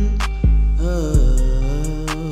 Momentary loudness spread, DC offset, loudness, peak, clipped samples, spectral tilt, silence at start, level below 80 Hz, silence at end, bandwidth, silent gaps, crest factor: 6 LU; under 0.1%; -20 LUFS; -4 dBFS; under 0.1%; -6.5 dB/octave; 0 s; -16 dBFS; 0 s; 11.5 kHz; none; 10 dB